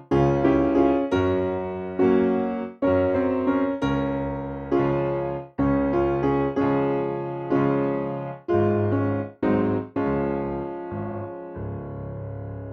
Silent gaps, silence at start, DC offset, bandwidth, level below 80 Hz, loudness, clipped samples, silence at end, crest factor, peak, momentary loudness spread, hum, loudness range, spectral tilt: none; 0 s; under 0.1%; 6.6 kHz; -44 dBFS; -24 LUFS; under 0.1%; 0 s; 16 dB; -6 dBFS; 13 LU; none; 4 LU; -9.5 dB/octave